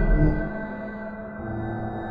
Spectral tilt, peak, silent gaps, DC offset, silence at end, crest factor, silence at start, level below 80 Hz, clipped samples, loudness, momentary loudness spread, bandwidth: -11 dB/octave; -8 dBFS; none; under 0.1%; 0 s; 16 dB; 0 s; -28 dBFS; under 0.1%; -29 LUFS; 12 LU; 4 kHz